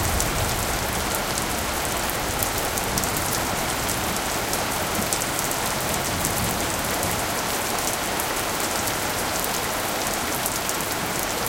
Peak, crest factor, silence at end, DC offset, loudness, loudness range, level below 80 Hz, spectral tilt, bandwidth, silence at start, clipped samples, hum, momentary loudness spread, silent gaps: 0 dBFS; 24 dB; 0 s; under 0.1%; -23 LUFS; 0 LU; -38 dBFS; -2.5 dB/octave; 17.5 kHz; 0 s; under 0.1%; none; 1 LU; none